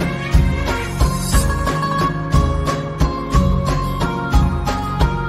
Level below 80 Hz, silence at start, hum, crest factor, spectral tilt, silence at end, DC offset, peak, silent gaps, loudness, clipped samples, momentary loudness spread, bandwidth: -20 dBFS; 0 s; none; 16 dB; -6 dB/octave; 0 s; under 0.1%; -2 dBFS; none; -18 LUFS; under 0.1%; 4 LU; 15 kHz